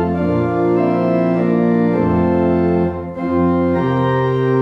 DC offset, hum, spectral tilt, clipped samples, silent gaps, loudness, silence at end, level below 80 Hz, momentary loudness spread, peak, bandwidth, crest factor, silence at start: under 0.1%; none; -10 dB/octave; under 0.1%; none; -16 LUFS; 0 s; -40 dBFS; 2 LU; -4 dBFS; 5.6 kHz; 12 dB; 0 s